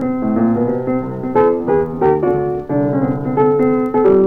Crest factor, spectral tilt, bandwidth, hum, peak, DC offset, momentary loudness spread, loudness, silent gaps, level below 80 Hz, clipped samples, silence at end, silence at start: 12 dB; -11 dB/octave; 4.1 kHz; none; -2 dBFS; under 0.1%; 5 LU; -16 LUFS; none; -44 dBFS; under 0.1%; 0 s; 0 s